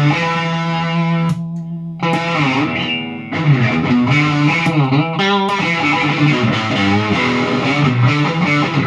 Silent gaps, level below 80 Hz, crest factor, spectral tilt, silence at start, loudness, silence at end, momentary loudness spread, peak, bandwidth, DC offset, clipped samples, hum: none; -52 dBFS; 14 dB; -6.5 dB/octave; 0 s; -15 LUFS; 0 s; 6 LU; 0 dBFS; 9.8 kHz; under 0.1%; under 0.1%; none